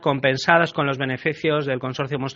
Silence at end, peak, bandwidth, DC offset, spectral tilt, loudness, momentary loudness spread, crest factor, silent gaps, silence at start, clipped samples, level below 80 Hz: 0 s; 0 dBFS; 7.4 kHz; under 0.1%; -3.5 dB/octave; -21 LUFS; 8 LU; 22 dB; none; 0 s; under 0.1%; -60 dBFS